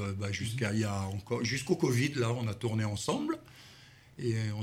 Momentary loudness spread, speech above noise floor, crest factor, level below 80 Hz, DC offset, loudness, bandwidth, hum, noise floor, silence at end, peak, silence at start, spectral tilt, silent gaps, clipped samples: 11 LU; 24 dB; 18 dB; -62 dBFS; under 0.1%; -33 LUFS; 15.5 kHz; none; -56 dBFS; 0 s; -16 dBFS; 0 s; -5.5 dB/octave; none; under 0.1%